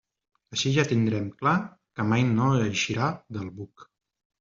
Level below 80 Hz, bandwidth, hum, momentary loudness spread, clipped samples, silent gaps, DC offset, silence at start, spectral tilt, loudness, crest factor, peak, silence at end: -60 dBFS; 7.6 kHz; none; 15 LU; under 0.1%; none; under 0.1%; 0.5 s; -5 dB/octave; -26 LUFS; 18 dB; -8 dBFS; 0.6 s